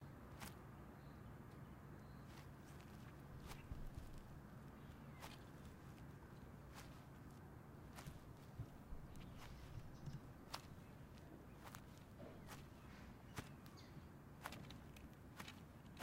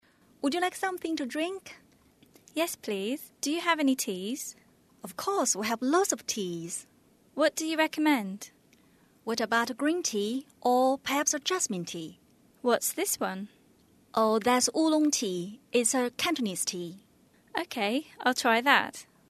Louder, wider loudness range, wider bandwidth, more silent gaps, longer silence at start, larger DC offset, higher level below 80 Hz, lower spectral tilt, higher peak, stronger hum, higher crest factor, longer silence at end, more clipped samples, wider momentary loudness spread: second, -58 LUFS vs -29 LUFS; about the same, 2 LU vs 4 LU; first, 16 kHz vs 13.5 kHz; neither; second, 0 s vs 0.45 s; neither; first, -64 dBFS vs -74 dBFS; first, -5.5 dB/octave vs -2.5 dB/octave; second, -28 dBFS vs -6 dBFS; neither; about the same, 28 dB vs 24 dB; second, 0 s vs 0.25 s; neither; second, 4 LU vs 14 LU